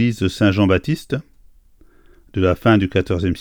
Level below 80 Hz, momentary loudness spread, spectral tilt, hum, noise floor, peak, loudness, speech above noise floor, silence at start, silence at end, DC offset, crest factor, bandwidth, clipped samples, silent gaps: -42 dBFS; 11 LU; -7 dB/octave; none; -49 dBFS; -2 dBFS; -18 LUFS; 32 dB; 0 s; 0 s; under 0.1%; 18 dB; 17 kHz; under 0.1%; none